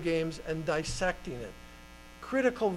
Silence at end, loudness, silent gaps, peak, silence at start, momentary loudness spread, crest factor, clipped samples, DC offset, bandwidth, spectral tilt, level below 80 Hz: 0 s; -33 LUFS; none; -14 dBFS; 0 s; 21 LU; 18 dB; under 0.1%; under 0.1%; 15.5 kHz; -5 dB/octave; -48 dBFS